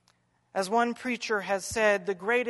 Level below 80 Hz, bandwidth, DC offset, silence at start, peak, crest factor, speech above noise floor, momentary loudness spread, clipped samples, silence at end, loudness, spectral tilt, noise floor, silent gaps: -62 dBFS; 11.5 kHz; under 0.1%; 0.55 s; -10 dBFS; 18 dB; 41 dB; 7 LU; under 0.1%; 0 s; -28 LUFS; -3.5 dB/octave; -69 dBFS; none